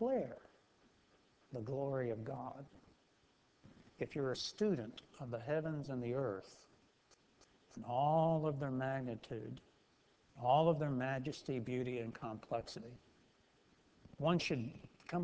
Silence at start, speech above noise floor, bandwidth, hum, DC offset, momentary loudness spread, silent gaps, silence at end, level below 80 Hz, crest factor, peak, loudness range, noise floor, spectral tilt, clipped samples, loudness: 0 s; 34 dB; 8 kHz; none; under 0.1%; 18 LU; none; 0 s; -72 dBFS; 20 dB; -20 dBFS; 7 LU; -73 dBFS; -6.5 dB/octave; under 0.1%; -40 LUFS